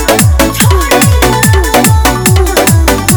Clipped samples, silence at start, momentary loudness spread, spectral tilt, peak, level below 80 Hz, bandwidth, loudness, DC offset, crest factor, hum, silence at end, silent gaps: 2%; 0 s; 1 LU; -4.5 dB/octave; 0 dBFS; -14 dBFS; over 20 kHz; -7 LUFS; under 0.1%; 6 dB; none; 0 s; none